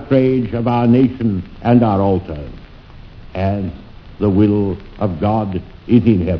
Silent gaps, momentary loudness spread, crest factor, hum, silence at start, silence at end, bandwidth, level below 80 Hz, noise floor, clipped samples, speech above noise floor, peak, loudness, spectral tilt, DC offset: none; 15 LU; 16 dB; none; 0 s; 0 s; 5.4 kHz; -38 dBFS; -37 dBFS; under 0.1%; 22 dB; 0 dBFS; -16 LUFS; -11 dB/octave; under 0.1%